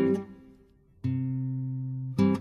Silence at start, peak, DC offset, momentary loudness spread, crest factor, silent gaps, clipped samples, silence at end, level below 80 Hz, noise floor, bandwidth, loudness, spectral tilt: 0 s; -14 dBFS; under 0.1%; 8 LU; 16 dB; none; under 0.1%; 0 s; -62 dBFS; -59 dBFS; 6.8 kHz; -31 LUFS; -9.5 dB/octave